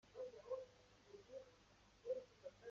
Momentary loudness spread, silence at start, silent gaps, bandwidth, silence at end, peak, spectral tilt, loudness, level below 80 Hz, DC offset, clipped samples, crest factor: 15 LU; 0.05 s; none; 7.4 kHz; 0 s; -36 dBFS; -3.5 dB/octave; -54 LUFS; -80 dBFS; under 0.1%; under 0.1%; 18 dB